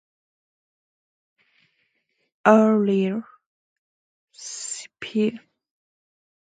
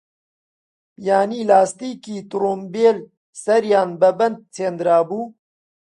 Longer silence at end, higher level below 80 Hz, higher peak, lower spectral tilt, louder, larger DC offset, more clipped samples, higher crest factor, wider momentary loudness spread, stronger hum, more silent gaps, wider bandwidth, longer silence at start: first, 1.15 s vs 0.6 s; about the same, -74 dBFS vs -70 dBFS; about the same, 0 dBFS vs -2 dBFS; about the same, -5.5 dB/octave vs -5.5 dB/octave; second, -22 LUFS vs -19 LUFS; neither; neither; first, 26 dB vs 18 dB; first, 17 LU vs 14 LU; neither; first, 3.46-4.28 s vs 3.17-3.33 s; second, 9.4 kHz vs 11.5 kHz; first, 2.45 s vs 1 s